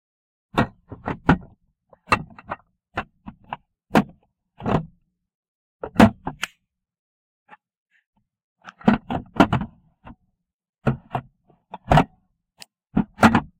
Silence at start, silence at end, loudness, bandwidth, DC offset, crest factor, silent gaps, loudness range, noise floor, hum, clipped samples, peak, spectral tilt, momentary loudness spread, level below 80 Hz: 0.55 s; 0.15 s; -22 LUFS; 16 kHz; under 0.1%; 24 dB; 5.35-5.79 s, 6.99-7.46 s, 7.77-7.86 s, 8.06-8.13 s, 8.44-8.56 s, 10.53-10.59 s, 10.69-10.73 s; 5 LU; -72 dBFS; none; under 0.1%; -2 dBFS; -6.5 dB/octave; 20 LU; -42 dBFS